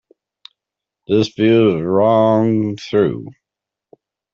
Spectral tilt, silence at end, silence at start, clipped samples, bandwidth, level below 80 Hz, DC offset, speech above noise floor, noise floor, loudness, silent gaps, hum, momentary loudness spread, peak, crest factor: -7.5 dB/octave; 1 s; 1.1 s; under 0.1%; 7.2 kHz; -56 dBFS; under 0.1%; 70 dB; -85 dBFS; -15 LUFS; none; none; 7 LU; -2 dBFS; 14 dB